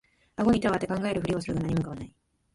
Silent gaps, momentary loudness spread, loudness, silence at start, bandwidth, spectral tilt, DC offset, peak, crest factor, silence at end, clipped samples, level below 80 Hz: none; 17 LU; -28 LUFS; 0.4 s; 11.5 kHz; -7 dB/octave; under 0.1%; -12 dBFS; 16 dB; 0.45 s; under 0.1%; -50 dBFS